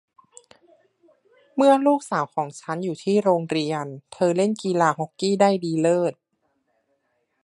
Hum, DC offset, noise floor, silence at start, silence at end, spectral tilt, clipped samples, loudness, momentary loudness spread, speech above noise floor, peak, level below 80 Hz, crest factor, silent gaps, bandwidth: none; under 0.1%; -71 dBFS; 1.55 s; 1.35 s; -6 dB/octave; under 0.1%; -22 LUFS; 11 LU; 50 dB; -4 dBFS; -74 dBFS; 20 dB; none; 11.5 kHz